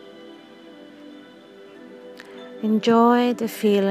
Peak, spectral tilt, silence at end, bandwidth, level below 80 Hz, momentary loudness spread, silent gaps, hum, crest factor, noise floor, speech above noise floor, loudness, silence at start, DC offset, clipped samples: -4 dBFS; -6 dB/octave; 0 s; 15.5 kHz; -78 dBFS; 27 LU; none; none; 18 dB; -45 dBFS; 27 dB; -19 LUFS; 0.2 s; under 0.1%; under 0.1%